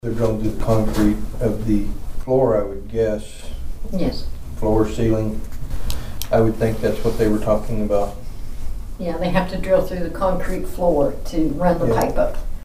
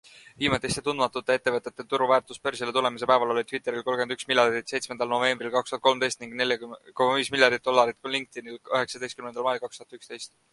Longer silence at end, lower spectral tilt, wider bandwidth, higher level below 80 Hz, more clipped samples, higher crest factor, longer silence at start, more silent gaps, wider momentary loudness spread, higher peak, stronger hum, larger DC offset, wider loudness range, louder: second, 0 s vs 0.25 s; first, -7 dB/octave vs -3 dB/octave; first, 15.5 kHz vs 11.5 kHz; first, -26 dBFS vs -62 dBFS; neither; second, 16 dB vs 24 dB; about the same, 0.05 s vs 0.15 s; neither; about the same, 14 LU vs 12 LU; about the same, -2 dBFS vs -2 dBFS; neither; neither; about the same, 2 LU vs 1 LU; first, -21 LUFS vs -26 LUFS